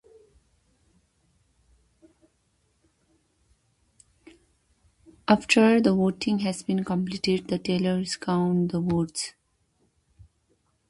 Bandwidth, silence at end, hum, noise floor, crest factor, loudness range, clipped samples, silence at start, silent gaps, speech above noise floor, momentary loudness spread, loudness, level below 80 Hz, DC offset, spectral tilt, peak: 11.5 kHz; 1.6 s; none; -70 dBFS; 24 dB; 5 LU; under 0.1%; 5.3 s; none; 46 dB; 10 LU; -25 LUFS; -60 dBFS; under 0.1%; -5.5 dB/octave; -4 dBFS